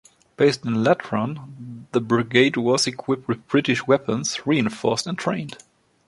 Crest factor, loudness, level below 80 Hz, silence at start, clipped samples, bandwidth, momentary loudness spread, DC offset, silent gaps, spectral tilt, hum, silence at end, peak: 20 dB; -22 LUFS; -62 dBFS; 0.4 s; under 0.1%; 11.5 kHz; 10 LU; under 0.1%; none; -4.5 dB/octave; none; 0.55 s; -2 dBFS